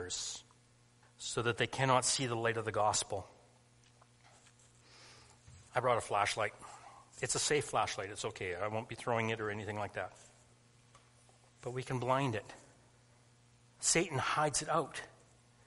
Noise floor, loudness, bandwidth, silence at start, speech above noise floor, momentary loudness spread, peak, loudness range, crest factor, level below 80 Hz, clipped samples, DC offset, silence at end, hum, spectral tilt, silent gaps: -66 dBFS; -35 LUFS; 11.5 kHz; 0 s; 31 dB; 17 LU; -14 dBFS; 7 LU; 24 dB; -68 dBFS; under 0.1%; under 0.1%; 0.55 s; none; -3 dB/octave; none